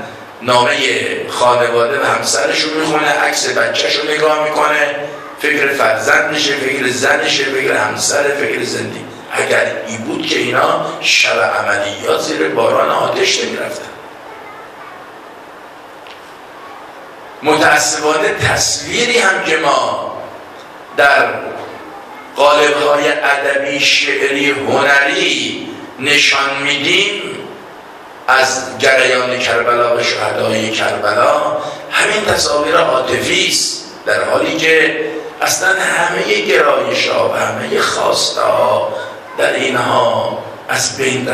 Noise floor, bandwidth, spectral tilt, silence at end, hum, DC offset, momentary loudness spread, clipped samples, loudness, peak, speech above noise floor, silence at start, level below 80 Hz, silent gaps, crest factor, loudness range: -34 dBFS; 14.5 kHz; -2 dB/octave; 0 s; none; under 0.1%; 19 LU; under 0.1%; -13 LUFS; 0 dBFS; 21 dB; 0 s; -52 dBFS; none; 14 dB; 4 LU